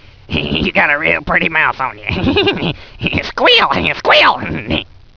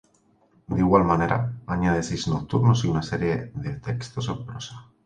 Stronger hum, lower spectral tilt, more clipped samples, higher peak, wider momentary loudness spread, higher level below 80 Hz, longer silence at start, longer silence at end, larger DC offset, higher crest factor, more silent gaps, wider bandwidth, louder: neither; about the same, -5.5 dB/octave vs -6.5 dB/octave; neither; first, 0 dBFS vs -4 dBFS; about the same, 11 LU vs 13 LU; first, -34 dBFS vs -44 dBFS; second, 0.3 s vs 0.7 s; about the same, 0.3 s vs 0.25 s; neither; second, 14 dB vs 20 dB; neither; second, 5.4 kHz vs 9.4 kHz; first, -13 LUFS vs -24 LUFS